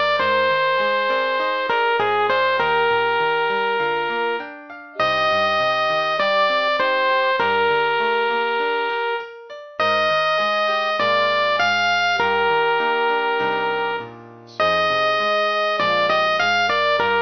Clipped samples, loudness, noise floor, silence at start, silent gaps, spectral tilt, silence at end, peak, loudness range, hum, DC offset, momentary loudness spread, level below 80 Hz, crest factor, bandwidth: under 0.1%; -19 LUFS; -40 dBFS; 0 s; none; -3.5 dB/octave; 0 s; -6 dBFS; 2 LU; none; 0.3%; 5 LU; -62 dBFS; 14 dB; 6.4 kHz